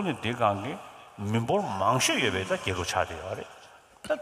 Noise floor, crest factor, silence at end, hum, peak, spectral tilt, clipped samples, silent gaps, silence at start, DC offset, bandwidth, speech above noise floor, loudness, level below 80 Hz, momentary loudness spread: -49 dBFS; 20 dB; 0 s; none; -10 dBFS; -4 dB/octave; under 0.1%; none; 0 s; under 0.1%; 15.5 kHz; 20 dB; -28 LUFS; -58 dBFS; 16 LU